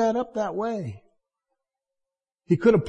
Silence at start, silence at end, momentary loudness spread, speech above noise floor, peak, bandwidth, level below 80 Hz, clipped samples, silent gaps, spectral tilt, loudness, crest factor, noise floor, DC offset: 0 s; 0 s; 12 LU; 64 dB; -8 dBFS; 8.2 kHz; -60 dBFS; under 0.1%; none; -8 dB/octave; -26 LUFS; 18 dB; -87 dBFS; under 0.1%